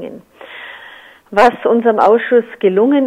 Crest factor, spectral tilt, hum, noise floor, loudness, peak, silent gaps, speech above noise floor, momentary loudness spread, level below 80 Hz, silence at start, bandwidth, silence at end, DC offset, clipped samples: 14 dB; -6.5 dB/octave; none; -39 dBFS; -12 LUFS; 0 dBFS; none; 27 dB; 21 LU; -54 dBFS; 0 s; 10 kHz; 0 s; under 0.1%; under 0.1%